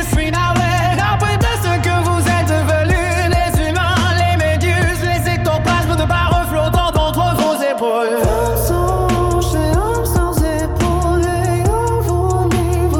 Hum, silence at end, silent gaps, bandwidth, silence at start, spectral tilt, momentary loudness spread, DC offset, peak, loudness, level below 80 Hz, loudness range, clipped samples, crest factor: none; 0 s; none; 18 kHz; 0 s; -5.5 dB/octave; 2 LU; under 0.1%; 0 dBFS; -15 LUFS; -24 dBFS; 1 LU; under 0.1%; 14 dB